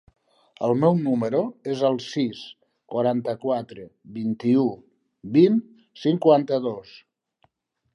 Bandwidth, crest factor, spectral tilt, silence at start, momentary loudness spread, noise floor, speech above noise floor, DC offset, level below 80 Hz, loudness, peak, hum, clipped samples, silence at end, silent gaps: 10.5 kHz; 20 dB; -8 dB/octave; 0.6 s; 20 LU; -67 dBFS; 45 dB; under 0.1%; -70 dBFS; -23 LUFS; -4 dBFS; none; under 0.1%; 1.15 s; none